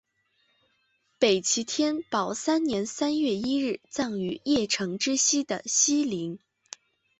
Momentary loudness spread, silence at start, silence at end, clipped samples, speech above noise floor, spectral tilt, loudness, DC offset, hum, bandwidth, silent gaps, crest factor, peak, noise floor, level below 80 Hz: 12 LU; 1.2 s; 0.8 s; under 0.1%; 45 dB; -2.5 dB/octave; -26 LUFS; under 0.1%; none; 8.2 kHz; none; 20 dB; -8 dBFS; -71 dBFS; -66 dBFS